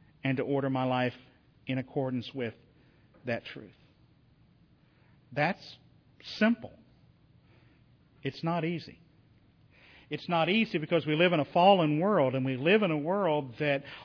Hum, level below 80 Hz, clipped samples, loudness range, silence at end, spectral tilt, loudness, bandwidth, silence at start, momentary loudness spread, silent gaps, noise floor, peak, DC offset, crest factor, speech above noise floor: none; -70 dBFS; under 0.1%; 13 LU; 0 s; -8 dB/octave; -29 LUFS; 5.4 kHz; 0.25 s; 16 LU; none; -63 dBFS; -10 dBFS; under 0.1%; 22 dB; 34 dB